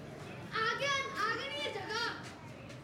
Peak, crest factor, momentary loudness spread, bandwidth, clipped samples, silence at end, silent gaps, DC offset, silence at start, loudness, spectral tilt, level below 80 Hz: -22 dBFS; 16 dB; 15 LU; 16 kHz; under 0.1%; 0 s; none; under 0.1%; 0 s; -35 LUFS; -3 dB/octave; -68 dBFS